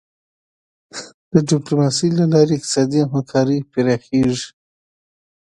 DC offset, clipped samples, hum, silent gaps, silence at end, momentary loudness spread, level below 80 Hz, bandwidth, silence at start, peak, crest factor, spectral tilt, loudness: under 0.1%; under 0.1%; none; 1.14-1.31 s; 0.95 s; 18 LU; -54 dBFS; 11.5 kHz; 0.95 s; 0 dBFS; 18 dB; -6 dB/octave; -17 LUFS